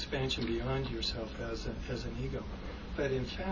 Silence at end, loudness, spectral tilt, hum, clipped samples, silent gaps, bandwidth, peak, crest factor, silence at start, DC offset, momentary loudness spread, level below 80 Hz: 0 s; -37 LUFS; -5.5 dB/octave; none; under 0.1%; none; 7.6 kHz; -20 dBFS; 16 dB; 0 s; under 0.1%; 7 LU; -44 dBFS